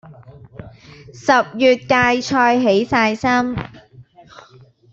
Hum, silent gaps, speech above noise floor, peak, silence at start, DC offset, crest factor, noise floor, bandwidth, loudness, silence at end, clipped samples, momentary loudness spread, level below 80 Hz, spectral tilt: none; none; 31 dB; -2 dBFS; 0.05 s; under 0.1%; 16 dB; -47 dBFS; 7.8 kHz; -16 LUFS; 0.9 s; under 0.1%; 10 LU; -50 dBFS; -5 dB/octave